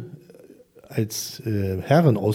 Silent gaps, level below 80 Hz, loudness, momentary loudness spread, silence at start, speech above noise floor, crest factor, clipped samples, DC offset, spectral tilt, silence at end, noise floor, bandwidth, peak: none; -60 dBFS; -23 LUFS; 13 LU; 0 s; 28 dB; 18 dB; under 0.1%; under 0.1%; -6.5 dB/octave; 0 s; -49 dBFS; 17 kHz; -4 dBFS